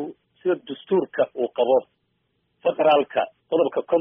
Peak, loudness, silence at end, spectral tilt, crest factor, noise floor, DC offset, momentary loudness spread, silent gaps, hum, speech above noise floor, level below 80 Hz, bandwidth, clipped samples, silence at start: -6 dBFS; -23 LUFS; 0 s; -3.5 dB/octave; 16 dB; -71 dBFS; under 0.1%; 8 LU; none; none; 50 dB; -72 dBFS; 3.8 kHz; under 0.1%; 0 s